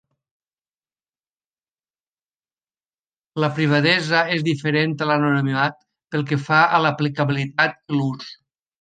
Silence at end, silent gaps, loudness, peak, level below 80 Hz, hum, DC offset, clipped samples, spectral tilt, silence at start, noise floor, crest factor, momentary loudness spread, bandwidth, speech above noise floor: 0.5 s; none; -20 LUFS; -2 dBFS; -66 dBFS; none; under 0.1%; under 0.1%; -6.5 dB/octave; 3.35 s; under -90 dBFS; 20 dB; 10 LU; 9.2 kHz; over 70 dB